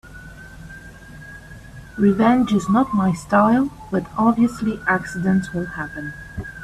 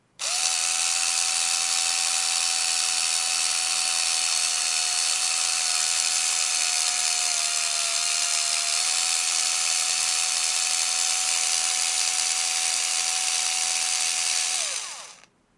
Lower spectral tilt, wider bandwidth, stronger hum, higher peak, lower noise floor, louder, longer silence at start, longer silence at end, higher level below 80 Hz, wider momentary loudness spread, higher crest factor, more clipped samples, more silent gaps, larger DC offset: first, -7 dB/octave vs 4.5 dB/octave; first, 13 kHz vs 11.5 kHz; neither; about the same, -4 dBFS vs -4 dBFS; second, -40 dBFS vs -51 dBFS; about the same, -19 LUFS vs -21 LUFS; second, 0.05 s vs 0.2 s; second, 0 s vs 0.4 s; first, -44 dBFS vs -78 dBFS; first, 23 LU vs 1 LU; about the same, 16 dB vs 20 dB; neither; neither; neither